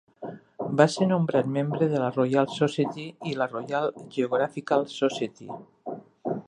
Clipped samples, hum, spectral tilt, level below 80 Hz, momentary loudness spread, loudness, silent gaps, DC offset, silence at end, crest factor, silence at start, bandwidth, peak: under 0.1%; none; -6.5 dB/octave; -72 dBFS; 17 LU; -26 LUFS; none; under 0.1%; 0.05 s; 24 dB; 0.2 s; 10.5 kHz; -4 dBFS